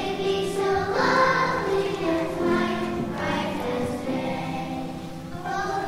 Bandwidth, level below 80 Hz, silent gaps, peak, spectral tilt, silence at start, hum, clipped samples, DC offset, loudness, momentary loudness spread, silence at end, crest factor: 16 kHz; -48 dBFS; none; -8 dBFS; -5.5 dB/octave; 0 s; none; under 0.1%; under 0.1%; -25 LUFS; 11 LU; 0 s; 16 dB